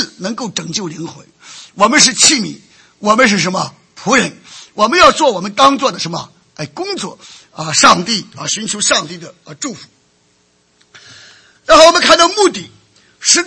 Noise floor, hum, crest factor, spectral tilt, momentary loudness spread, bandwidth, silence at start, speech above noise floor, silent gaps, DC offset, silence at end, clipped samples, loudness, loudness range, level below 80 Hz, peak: -56 dBFS; none; 14 dB; -2 dB/octave; 20 LU; 11 kHz; 0 s; 43 dB; none; under 0.1%; 0 s; 0.5%; -11 LUFS; 3 LU; -48 dBFS; 0 dBFS